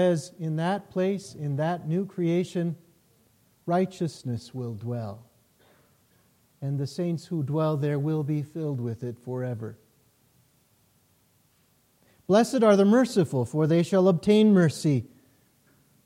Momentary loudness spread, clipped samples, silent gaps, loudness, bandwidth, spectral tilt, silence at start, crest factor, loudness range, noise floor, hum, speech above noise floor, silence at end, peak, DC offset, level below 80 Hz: 15 LU; under 0.1%; none; -26 LUFS; 15.5 kHz; -7 dB/octave; 0 s; 18 dB; 13 LU; -65 dBFS; none; 41 dB; 1 s; -8 dBFS; under 0.1%; -68 dBFS